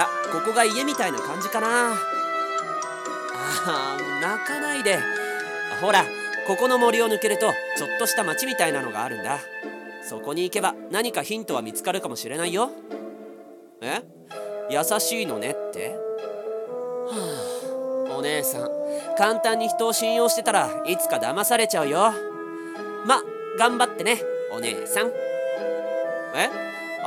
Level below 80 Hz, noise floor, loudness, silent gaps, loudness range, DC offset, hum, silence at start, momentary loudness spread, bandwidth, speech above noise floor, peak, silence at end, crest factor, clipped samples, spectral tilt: -82 dBFS; -45 dBFS; -24 LUFS; none; 6 LU; under 0.1%; none; 0 s; 11 LU; 18 kHz; 21 dB; -2 dBFS; 0 s; 22 dB; under 0.1%; -2 dB/octave